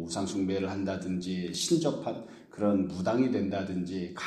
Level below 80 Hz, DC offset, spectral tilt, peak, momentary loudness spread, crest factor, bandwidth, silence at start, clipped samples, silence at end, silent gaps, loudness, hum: -64 dBFS; under 0.1%; -5.5 dB/octave; -14 dBFS; 8 LU; 16 dB; 13.5 kHz; 0 s; under 0.1%; 0 s; none; -31 LUFS; none